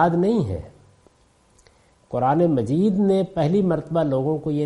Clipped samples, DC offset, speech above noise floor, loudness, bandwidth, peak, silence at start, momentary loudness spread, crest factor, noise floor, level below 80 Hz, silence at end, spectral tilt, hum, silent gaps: under 0.1%; under 0.1%; 39 dB; -21 LUFS; 11 kHz; -4 dBFS; 0 s; 5 LU; 16 dB; -59 dBFS; -52 dBFS; 0 s; -9 dB/octave; none; none